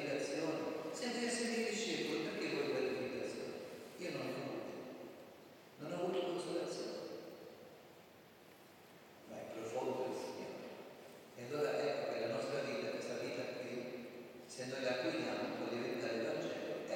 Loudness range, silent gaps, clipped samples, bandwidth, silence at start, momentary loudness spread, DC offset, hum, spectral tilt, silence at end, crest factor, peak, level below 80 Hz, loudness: 7 LU; none; under 0.1%; 17 kHz; 0 s; 19 LU; under 0.1%; none; -4 dB/octave; 0 s; 18 dB; -24 dBFS; -88 dBFS; -42 LUFS